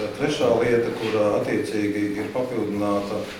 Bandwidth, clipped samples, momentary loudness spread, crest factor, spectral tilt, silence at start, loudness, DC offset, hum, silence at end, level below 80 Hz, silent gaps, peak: 17 kHz; under 0.1%; 6 LU; 16 dB; -6 dB/octave; 0 s; -23 LUFS; under 0.1%; none; 0 s; -54 dBFS; none; -8 dBFS